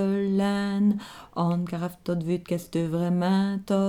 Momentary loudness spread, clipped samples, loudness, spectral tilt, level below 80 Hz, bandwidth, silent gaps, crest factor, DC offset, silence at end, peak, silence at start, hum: 7 LU; under 0.1%; -26 LUFS; -7.5 dB/octave; -60 dBFS; 15.5 kHz; none; 12 dB; under 0.1%; 0 s; -12 dBFS; 0 s; none